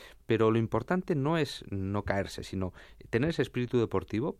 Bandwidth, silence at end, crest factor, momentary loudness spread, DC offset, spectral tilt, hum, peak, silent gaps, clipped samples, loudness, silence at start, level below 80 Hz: 14 kHz; 0.05 s; 18 dB; 10 LU; under 0.1%; -7 dB/octave; none; -12 dBFS; none; under 0.1%; -31 LUFS; 0 s; -54 dBFS